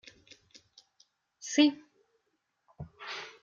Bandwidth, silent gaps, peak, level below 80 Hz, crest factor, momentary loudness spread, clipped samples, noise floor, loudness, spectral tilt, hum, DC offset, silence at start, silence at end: 7.6 kHz; none; -12 dBFS; -70 dBFS; 24 dB; 24 LU; under 0.1%; -80 dBFS; -29 LUFS; -3 dB/octave; none; under 0.1%; 1.4 s; 0.15 s